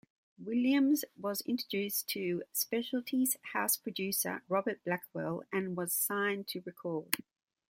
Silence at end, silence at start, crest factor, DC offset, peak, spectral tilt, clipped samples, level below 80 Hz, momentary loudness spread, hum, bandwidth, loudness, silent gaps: 0.55 s; 0.4 s; 26 dB; under 0.1%; -8 dBFS; -3.5 dB/octave; under 0.1%; -80 dBFS; 8 LU; none; 16.5 kHz; -34 LUFS; none